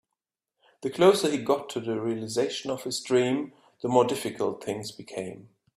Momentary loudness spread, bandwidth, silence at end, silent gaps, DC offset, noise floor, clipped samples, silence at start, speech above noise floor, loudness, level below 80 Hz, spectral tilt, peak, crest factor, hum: 15 LU; 14.5 kHz; 0.35 s; none; under 0.1%; -87 dBFS; under 0.1%; 0.8 s; 60 dB; -27 LUFS; -70 dBFS; -4.5 dB/octave; -6 dBFS; 22 dB; none